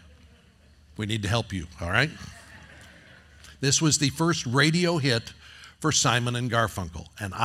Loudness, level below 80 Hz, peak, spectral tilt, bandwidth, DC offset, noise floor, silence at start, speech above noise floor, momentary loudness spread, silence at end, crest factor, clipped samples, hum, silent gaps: -25 LUFS; -54 dBFS; -4 dBFS; -3.5 dB/octave; 15.5 kHz; under 0.1%; -56 dBFS; 1 s; 31 dB; 16 LU; 0 s; 24 dB; under 0.1%; none; none